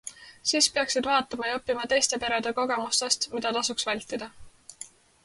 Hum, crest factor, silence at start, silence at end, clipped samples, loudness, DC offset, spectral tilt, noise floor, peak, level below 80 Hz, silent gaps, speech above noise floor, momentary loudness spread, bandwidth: none; 20 dB; 0.05 s; 0.35 s; under 0.1%; -26 LUFS; under 0.1%; -0.5 dB/octave; -48 dBFS; -8 dBFS; -62 dBFS; none; 21 dB; 20 LU; 12 kHz